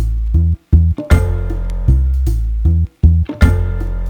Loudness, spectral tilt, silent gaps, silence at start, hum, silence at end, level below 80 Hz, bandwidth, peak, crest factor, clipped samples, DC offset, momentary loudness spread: -15 LUFS; -8 dB/octave; none; 0 s; none; 0 s; -14 dBFS; 9.2 kHz; 0 dBFS; 12 dB; under 0.1%; under 0.1%; 6 LU